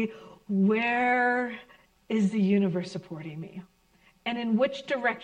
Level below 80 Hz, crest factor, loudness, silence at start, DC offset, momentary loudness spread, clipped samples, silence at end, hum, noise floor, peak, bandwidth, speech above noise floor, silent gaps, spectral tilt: -70 dBFS; 14 dB; -27 LUFS; 0 s; under 0.1%; 17 LU; under 0.1%; 0 s; none; -63 dBFS; -14 dBFS; 9 kHz; 36 dB; none; -7 dB/octave